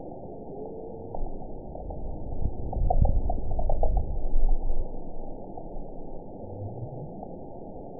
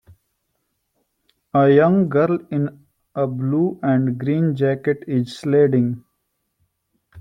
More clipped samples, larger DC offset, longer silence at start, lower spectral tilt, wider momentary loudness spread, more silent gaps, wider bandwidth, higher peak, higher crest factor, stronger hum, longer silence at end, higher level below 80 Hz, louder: neither; first, 0.6% vs under 0.1%; second, 0 s vs 1.55 s; first, -16.5 dB/octave vs -9 dB/octave; first, 13 LU vs 10 LU; neither; second, 1 kHz vs 10 kHz; second, -10 dBFS vs -2 dBFS; about the same, 16 dB vs 18 dB; neither; about the same, 0 s vs 0 s; first, -28 dBFS vs -62 dBFS; second, -35 LUFS vs -19 LUFS